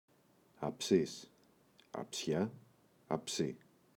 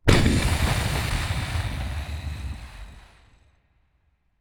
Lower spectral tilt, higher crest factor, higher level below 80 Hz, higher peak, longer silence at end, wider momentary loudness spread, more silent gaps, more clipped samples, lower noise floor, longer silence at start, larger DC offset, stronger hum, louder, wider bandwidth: about the same, -4.5 dB/octave vs -5 dB/octave; about the same, 24 dB vs 26 dB; second, -74 dBFS vs -30 dBFS; second, -16 dBFS vs 0 dBFS; second, 0.4 s vs 1.4 s; second, 15 LU vs 20 LU; neither; neither; about the same, -69 dBFS vs -67 dBFS; first, 0.6 s vs 0.05 s; neither; neither; second, -38 LUFS vs -26 LUFS; about the same, 19 kHz vs over 20 kHz